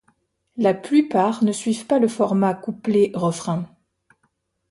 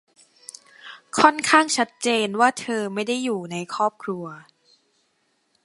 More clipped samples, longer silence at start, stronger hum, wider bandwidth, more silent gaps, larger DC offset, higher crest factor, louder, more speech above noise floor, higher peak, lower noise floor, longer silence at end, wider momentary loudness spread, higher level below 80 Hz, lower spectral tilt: neither; second, 0.55 s vs 0.85 s; neither; about the same, 11.5 kHz vs 11.5 kHz; neither; neither; second, 16 dB vs 24 dB; about the same, -21 LUFS vs -21 LUFS; about the same, 50 dB vs 47 dB; second, -6 dBFS vs 0 dBFS; about the same, -70 dBFS vs -69 dBFS; second, 1.05 s vs 1.25 s; second, 9 LU vs 24 LU; about the same, -66 dBFS vs -70 dBFS; first, -6.5 dB/octave vs -3 dB/octave